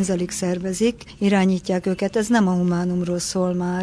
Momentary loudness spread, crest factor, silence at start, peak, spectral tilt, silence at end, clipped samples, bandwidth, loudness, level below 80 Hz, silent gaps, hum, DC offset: 5 LU; 14 dB; 0 s; -6 dBFS; -5.5 dB/octave; 0 s; under 0.1%; 11 kHz; -21 LUFS; -50 dBFS; none; none; under 0.1%